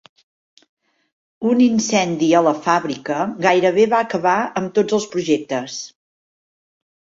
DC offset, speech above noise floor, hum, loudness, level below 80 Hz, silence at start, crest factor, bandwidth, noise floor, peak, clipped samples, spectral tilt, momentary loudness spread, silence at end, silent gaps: under 0.1%; over 73 dB; none; -18 LUFS; -62 dBFS; 1.4 s; 18 dB; 7.8 kHz; under -90 dBFS; -2 dBFS; under 0.1%; -4.5 dB/octave; 9 LU; 1.3 s; none